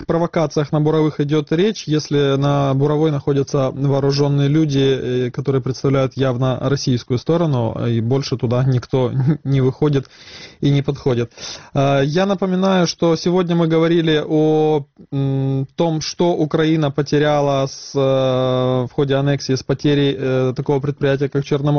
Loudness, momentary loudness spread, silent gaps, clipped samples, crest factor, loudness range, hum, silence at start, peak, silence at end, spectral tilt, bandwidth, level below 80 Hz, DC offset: -18 LUFS; 4 LU; none; under 0.1%; 12 dB; 2 LU; none; 0 s; -6 dBFS; 0 s; -6.5 dB/octave; 6.6 kHz; -48 dBFS; 0.2%